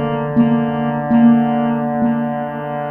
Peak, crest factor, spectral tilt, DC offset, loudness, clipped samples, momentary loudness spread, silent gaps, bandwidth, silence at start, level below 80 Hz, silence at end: -2 dBFS; 14 dB; -11 dB/octave; under 0.1%; -16 LUFS; under 0.1%; 10 LU; none; 3.2 kHz; 0 s; -50 dBFS; 0 s